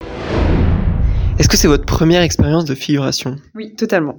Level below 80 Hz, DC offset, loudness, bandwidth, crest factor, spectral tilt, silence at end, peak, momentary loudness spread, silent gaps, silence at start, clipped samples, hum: -20 dBFS; under 0.1%; -15 LUFS; 19.5 kHz; 14 dB; -5 dB/octave; 0 s; 0 dBFS; 10 LU; none; 0 s; under 0.1%; none